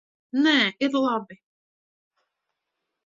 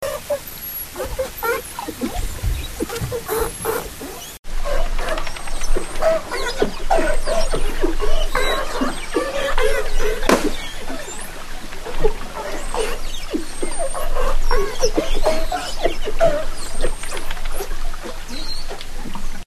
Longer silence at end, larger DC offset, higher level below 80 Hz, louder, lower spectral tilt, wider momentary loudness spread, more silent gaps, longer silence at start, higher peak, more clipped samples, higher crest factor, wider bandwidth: first, 1.7 s vs 0.05 s; neither; second, -78 dBFS vs -22 dBFS; about the same, -23 LUFS vs -24 LUFS; about the same, -4 dB/octave vs -3.5 dB/octave; about the same, 10 LU vs 11 LU; second, none vs 4.39-4.43 s; first, 0.35 s vs 0 s; second, -6 dBFS vs 0 dBFS; neither; about the same, 20 dB vs 18 dB; second, 7.6 kHz vs 14 kHz